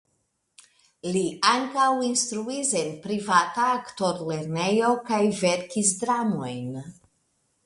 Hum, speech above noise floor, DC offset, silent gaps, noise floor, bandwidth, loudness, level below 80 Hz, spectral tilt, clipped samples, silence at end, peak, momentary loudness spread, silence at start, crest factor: none; 49 dB; under 0.1%; none; -73 dBFS; 11.5 kHz; -24 LUFS; -68 dBFS; -3.5 dB/octave; under 0.1%; 0.75 s; -6 dBFS; 9 LU; 1.05 s; 20 dB